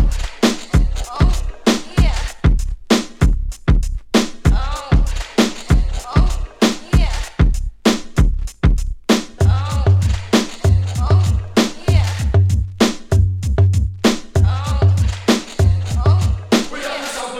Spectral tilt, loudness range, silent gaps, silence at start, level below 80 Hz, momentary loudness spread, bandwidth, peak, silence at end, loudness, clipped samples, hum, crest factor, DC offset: -6 dB/octave; 2 LU; none; 0 s; -20 dBFS; 4 LU; 14.5 kHz; 0 dBFS; 0 s; -18 LUFS; under 0.1%; none; 16 dB; under 0.1%